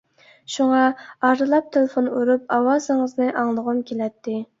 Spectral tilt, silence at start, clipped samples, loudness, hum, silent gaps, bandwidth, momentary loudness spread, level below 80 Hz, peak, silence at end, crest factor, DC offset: -4.5 dB/octave; 0.5 s; under 0.1%; -21 LUFS; none; none; 7.8 kHz; 9 LU; -70 dBFS; -4 dBFS; 0.15 s; 18 dB; under 0.1%